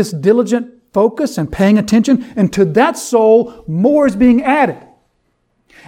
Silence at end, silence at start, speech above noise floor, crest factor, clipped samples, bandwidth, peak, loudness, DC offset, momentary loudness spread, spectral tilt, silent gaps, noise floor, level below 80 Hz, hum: 1.1 s; 0 s; 51 dB; 12 dB; under 0.1%; 15.5 kHz; 0 dBFS; -13 LUFS; under 0.1%; 8 LU; -6.5 dB/octave; none; -63 dBFS; -42 dBFS; none